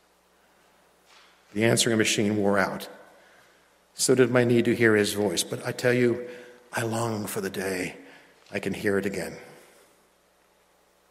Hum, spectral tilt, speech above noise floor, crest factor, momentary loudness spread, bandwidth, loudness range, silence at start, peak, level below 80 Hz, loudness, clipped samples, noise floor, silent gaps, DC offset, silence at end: none; -4 dB/octave; 39 dB; 22 dB; 17 LU; 16 kHz; 8 LU; 1.55 s; -6 dBFS; -70 dBFS; -25 LUFS; under 0.1%; -63 dBFS; none; under 0.1%; 1.55 s